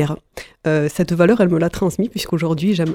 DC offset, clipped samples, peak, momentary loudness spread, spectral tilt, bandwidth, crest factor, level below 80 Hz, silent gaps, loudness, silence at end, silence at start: under 0.1%; under 0.1%; -2 dBFS; 10 LU; -6.5 dB/octave; 16.5 kHz; 16 dB; -44 dBFS; none; -18 LUFS; 0 s; 0 s